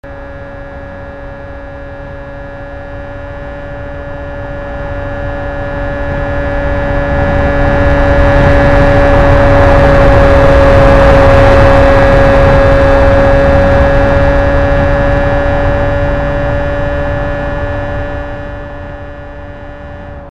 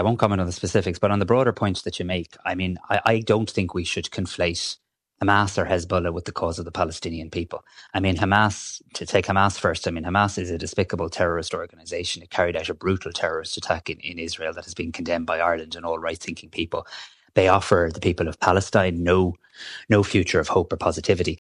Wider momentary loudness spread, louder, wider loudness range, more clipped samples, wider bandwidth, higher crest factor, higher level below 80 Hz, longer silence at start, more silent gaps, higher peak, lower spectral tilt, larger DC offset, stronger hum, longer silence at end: first, 21 LU vs 11 LU; first, -9 LUFS vs -23 LUFS; first, 18 LU vs 5 LU; first, 0.3% vs under 0.1%; second, 9.4 kHz vs 11 kHz; second, 10 dB vs 20 dB; first, -14 dBFS vs -46 dBFS; about the same, 0.05 s vs 0 s; neither; about the same, 0 dBFS vs -2 dBFS; first, -8 dB/octave vs -5 dB/octave; first, 2% vs under 0.1%; neither; about the same, 0 s vs 0.05 s